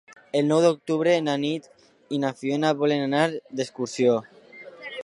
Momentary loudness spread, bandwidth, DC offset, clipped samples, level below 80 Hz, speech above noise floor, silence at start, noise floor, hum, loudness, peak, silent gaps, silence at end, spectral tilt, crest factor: 12 LU; 11 kHz; under 0.1%; under 0.1%; -76 dBFS; 22 dB; 0.1 s; -45 dBFS; none; -24 LUFS; -6 dBFS; none; 0 s; -5.5 dB/octave; 18 dB